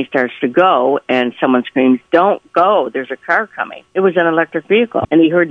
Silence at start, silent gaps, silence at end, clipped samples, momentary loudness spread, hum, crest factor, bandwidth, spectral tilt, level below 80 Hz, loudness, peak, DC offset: 0 s; none; 0 s; under 0.1%; 6 LU; none; 14 dB; 6 kHz; -7.5 dB/octave; -54 dBFS; -14 LUFS; 0 dBFS; under 0.1%